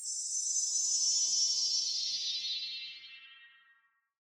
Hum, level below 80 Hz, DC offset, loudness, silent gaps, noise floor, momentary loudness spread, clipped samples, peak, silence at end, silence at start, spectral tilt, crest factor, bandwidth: none; -86 dBFS; under 0.1%; -30 LUFS; none; -71 dBFS; 17 LU; under 0.1%; -18 dBFS; 0.85 s; 0 s; 5.5 dB/octave; 16 dB; over 20 kHz